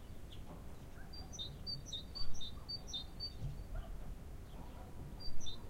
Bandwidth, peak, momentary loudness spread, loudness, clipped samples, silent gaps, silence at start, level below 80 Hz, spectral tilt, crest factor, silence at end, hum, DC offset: 15 kHz; -24 dBFS; 10 LU; -48 LUFS; under 0.1%; none; 0 s; -50 dBFS; -4 dB/octave; 16 dB; 0 s; none; under 0.1%